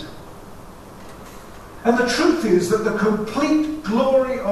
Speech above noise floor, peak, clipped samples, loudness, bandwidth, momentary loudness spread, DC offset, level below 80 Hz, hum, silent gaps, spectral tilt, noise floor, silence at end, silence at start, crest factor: 20 dB; -4 dBFS; under 0.1%; -19 LUFS; 13.5 kHz; 23 LU; under 0.1%; -46 dBFS; none; none; -5 dB/octave; -39 dBFS; 0 s; 0 s; 16 dB